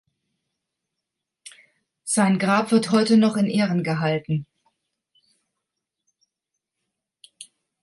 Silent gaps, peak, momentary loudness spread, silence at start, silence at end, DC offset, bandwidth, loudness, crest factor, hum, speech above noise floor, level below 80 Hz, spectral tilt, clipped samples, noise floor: none; -6 dBFS; 9 LU; 1.45 s; 0.4 s; under 0.1%; 11.5 kHz; -21 LUFS; 18 dB; none; 64 dB; -68 dBFS; -5.5 dB/octave; under 0.1%; -84 dBFS